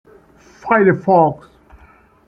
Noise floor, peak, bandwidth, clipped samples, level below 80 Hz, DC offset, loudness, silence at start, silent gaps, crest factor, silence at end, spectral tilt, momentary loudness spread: -49 dBFS; -2 dBFS; 6.8 kHz; under 0.1%; -52 dBFS; under 0.1%; -14 LUFS; 0.65 s; none; 16 dB; 0.95 s; -9.5 dB/octave; 21 LU